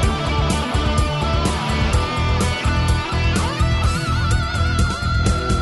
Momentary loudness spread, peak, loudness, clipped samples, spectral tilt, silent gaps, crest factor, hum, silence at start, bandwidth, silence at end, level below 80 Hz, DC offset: 1 LU; -4 dBFS; -19 LUFS; under 0.1%; -5 dB/octave; none; 14 dB; none; 0 s; 12 kHz; 0 s; -22 dBFS; under 0.1%